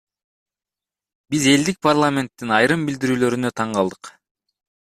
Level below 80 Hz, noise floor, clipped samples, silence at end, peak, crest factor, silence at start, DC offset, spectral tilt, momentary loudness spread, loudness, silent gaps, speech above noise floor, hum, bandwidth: -58 dBFS; -90 dBFS; under 0.1%; 0.8 s; -2 dBFS; 18 dB; 1.3 s; under 0.1%; -4.5 dB/octave; 7 LU; -19 LUFS; none; 71 dB; none; 14 kHz